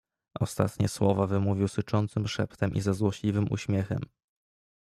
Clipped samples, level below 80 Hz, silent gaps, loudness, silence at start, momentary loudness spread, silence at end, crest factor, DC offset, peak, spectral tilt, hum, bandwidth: under 0.1%; -58 dBFS; none; -29 LUFS; 0.35 s; 8 LU; 0.75 s; 18 dB; under 0.1%; -10 dBFS; -7 dB/octave; none; 13.5 kHz